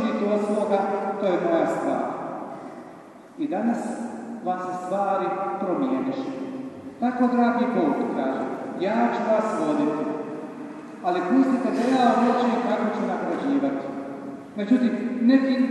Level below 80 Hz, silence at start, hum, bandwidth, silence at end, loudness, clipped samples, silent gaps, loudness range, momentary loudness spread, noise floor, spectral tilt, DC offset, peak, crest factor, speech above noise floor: -72 dBFS; 0 s; none; 11 kHz; 0 s; -24 LUFS; under 0.1%; none; 5 LU; 14 LU; -44 dBFS; -6.5 dB/octave; under 0.1%; -6 dBFS; 18 dB; 22 dB